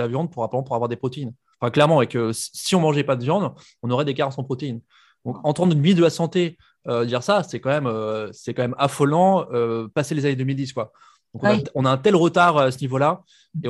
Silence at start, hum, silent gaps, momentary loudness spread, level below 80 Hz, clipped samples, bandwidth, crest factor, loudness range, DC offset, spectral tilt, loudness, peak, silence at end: 0 s; none; none; 13 LU; -64 dBFS; under 0.1%; 12.5 kHz; 20 dB; 2 LU; under 0.1%; -6 dB/octave; -21 LUFS; -2 dBFS; 0 s